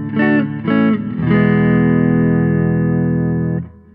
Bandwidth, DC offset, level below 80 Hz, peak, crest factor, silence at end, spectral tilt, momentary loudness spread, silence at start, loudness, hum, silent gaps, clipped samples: 4.1 kHz; under 0.1%; -40 dBFS; -2 dBFS; 12 dB; 0.25 s; -12 dB/octave; 5 LU; 0 s; -15 LUFS; 50 Hz at -45 dBFS; none; under 0.1%